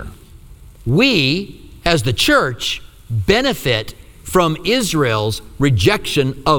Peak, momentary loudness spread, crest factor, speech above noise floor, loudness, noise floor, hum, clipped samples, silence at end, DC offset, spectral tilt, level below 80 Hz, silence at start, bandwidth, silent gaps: 0 dBFS; 12 LU; 16 dB; 24 dB; -16 LUFS; -40 dBFS; none; under 0.1%; 0 s; under 0.1%; -4.5 dB/octave; -36 dBFS; 0 s; over 20 kHz; none